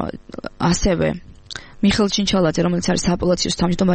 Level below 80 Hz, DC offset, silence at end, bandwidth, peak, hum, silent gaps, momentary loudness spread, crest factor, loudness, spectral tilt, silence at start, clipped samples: -34 dBFS; under 0.1%; 0 s; 8.8 kHz; -6 dBFS; none; none; 16 LU; 14 dB; -19 LUFS; -5 dB/octave; 0 s; under 0.1%